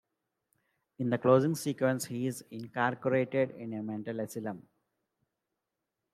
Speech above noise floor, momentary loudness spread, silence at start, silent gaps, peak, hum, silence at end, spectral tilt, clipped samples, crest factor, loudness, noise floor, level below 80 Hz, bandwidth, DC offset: 56 dB; 14 LU; 1 s; none; -12 dBFS; none; 1.5 s; -6 dB/octave; under 0.1%; 22 dB; -32 LUFS; -87 dBFS; -78 dBFS; 15.5 kHz; under 0.1%